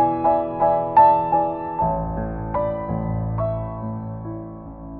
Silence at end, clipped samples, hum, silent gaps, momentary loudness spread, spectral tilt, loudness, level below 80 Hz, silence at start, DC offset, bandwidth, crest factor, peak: 0 s; under 0.1%; none; none; 17 LU; -9 dB/octave; -21 LUFS; -38 dBFS; 0 s; under 0.1%; 4.3 kHz; 18 dB; -4 dBFS